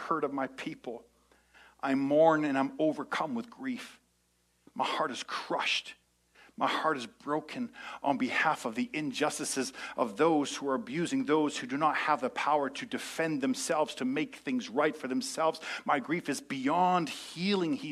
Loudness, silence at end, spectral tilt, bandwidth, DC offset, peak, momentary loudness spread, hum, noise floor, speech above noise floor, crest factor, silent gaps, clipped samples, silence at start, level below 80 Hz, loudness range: -31 LUFS; 0 s; -4 dB/octave; 14 kHz; under 0.1%; -12 dBFS; 10 LU; 60 Hz at -70 dBFS; -72 dBFS; 41 dB; 20 dB; none; under 0.1%; 0 s; -76 dBFS; 4 LU